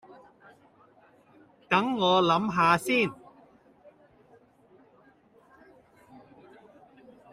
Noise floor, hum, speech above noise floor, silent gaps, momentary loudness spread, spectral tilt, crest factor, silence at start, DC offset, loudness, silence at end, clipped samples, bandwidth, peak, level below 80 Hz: -60 dBFS; none; 36 dB; none; 4 LU; -5 dB/octave; 24 dB; 1.7 s; under 0.1%; -24 LUFS; 4.2 s; under 0.1%; 15.5 kHz; -8 dBFS; -70 dBFS